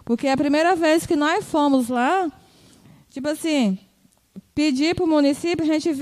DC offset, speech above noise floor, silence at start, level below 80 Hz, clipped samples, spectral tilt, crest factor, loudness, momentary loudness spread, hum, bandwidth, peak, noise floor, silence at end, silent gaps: under 0.1%; 40 dB; 0.05 s; -56 dBFS; under 0.1%; -4.5 dB/octave; 16 dB; -20 LUFS; 10 LU; none; 14.5 kHz; -6 dBFS; -59 dBFS; 0 s; none